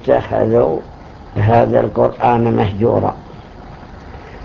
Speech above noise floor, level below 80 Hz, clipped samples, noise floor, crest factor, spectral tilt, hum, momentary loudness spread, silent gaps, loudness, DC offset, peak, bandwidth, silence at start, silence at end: 21 dB; -36 dBFS; under 0.1%; -34 dBFS; 16 dB; -9.5 dB/octave; none; 23 LU; none; -15 LUFS; under 0.1%; 0 dBFS; 6.6 kHz; 0 s; 0 s